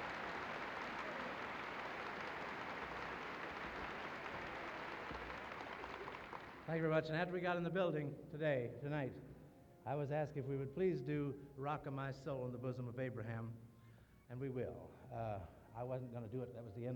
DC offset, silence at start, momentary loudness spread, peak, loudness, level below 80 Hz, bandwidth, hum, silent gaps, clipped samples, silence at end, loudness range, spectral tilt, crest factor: under 0.1%; 0 s; 11 LU; -24 dBFS; -45 LUFS; -68 dBFS; 19.5 kHz; none; none; under 0.1%; 0 s; 7 LU; -7 dB/octave; 20 dB